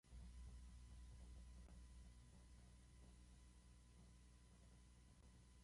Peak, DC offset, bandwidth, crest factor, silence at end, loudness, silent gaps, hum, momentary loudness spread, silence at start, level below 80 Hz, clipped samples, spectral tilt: -50 dBFS; under 0.1%; 11.5 kHz; 12 dB; 0 s; -66 LUFS; none; 60 Hz at -65 dBFS; 7 LU; 0.05 s; -64 dBFS; under 0.1%; -5 dB/octave